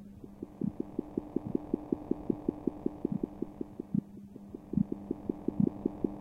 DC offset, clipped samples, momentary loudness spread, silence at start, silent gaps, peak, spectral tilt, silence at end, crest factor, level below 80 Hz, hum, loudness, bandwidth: under 0.1%; under 0.1%; 15 LU; 0 s; none; -14 dBFS; -11 dB/octave; 0 s; 22 dB; -56 dBFS; none; -36 LUFS; 4.8 kHz